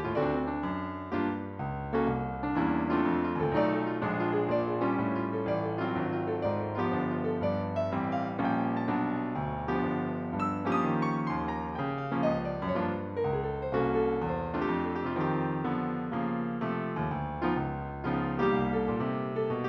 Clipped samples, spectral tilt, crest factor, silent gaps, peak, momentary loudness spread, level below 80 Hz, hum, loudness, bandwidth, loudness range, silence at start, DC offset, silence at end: under 0.1%; -9 dB/octave; 16 dB; none; -14 dBFS; 5 LU; -52 dBFS; none; -31 LUFS; 7.4 kHz; 2 LU; 0 s; under 0.1%; 0 s